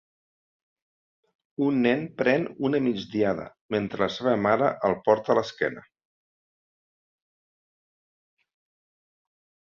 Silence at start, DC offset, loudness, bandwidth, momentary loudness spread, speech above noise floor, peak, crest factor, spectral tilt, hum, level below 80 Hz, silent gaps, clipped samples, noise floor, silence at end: 1.6 s; under 0.1%; -25 LUFS; 7.2 kHz; 8 LU; over 65 dB; -6 dBFS; 22 dB; -7 dB/octave; none; -64 dBFS; 3.61-3.69 s; under 0.1%; under -90 dBFS; 3.9 s